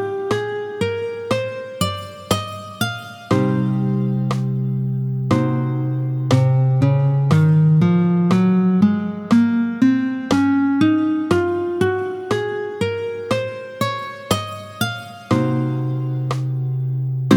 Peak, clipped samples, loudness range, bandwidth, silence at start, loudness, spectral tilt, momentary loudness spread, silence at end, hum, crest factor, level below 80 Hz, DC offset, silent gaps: 0 dBFS; under 0.1%; 7 LU; 19 kHz; 0 s; -19 LUFS; -7 dB/octave; 9 LU; 0 s; none; 18 dB; -54 dBFS; under 0.1%; none